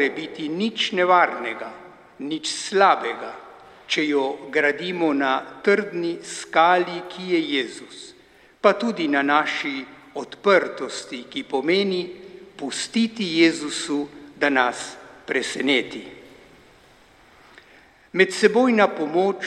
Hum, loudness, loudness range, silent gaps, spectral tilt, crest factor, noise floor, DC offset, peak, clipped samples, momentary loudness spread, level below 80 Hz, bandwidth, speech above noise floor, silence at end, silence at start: none; -22 LUFS; 3 LU; none; -3.5 dB/octave; 20 dB; -53 dBFS; under 0.1%; -2 dBFS; under 0.1%; 18 LU; -68 dBFS; 12 kHz; 31 dB; 0 s; 0 s